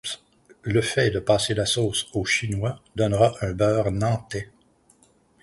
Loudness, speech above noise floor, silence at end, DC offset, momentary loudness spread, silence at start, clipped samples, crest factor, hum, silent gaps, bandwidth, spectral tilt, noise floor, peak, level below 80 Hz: -23 LUFS; 37 dB; 1 s; under 0.1%; 13 LU; 0.05 s; under 0.1%; 18 dB; none; none; 11.5 kHz; -4.5 dB/octave; -60 dBFS; -6 dBFS; -46 dBFS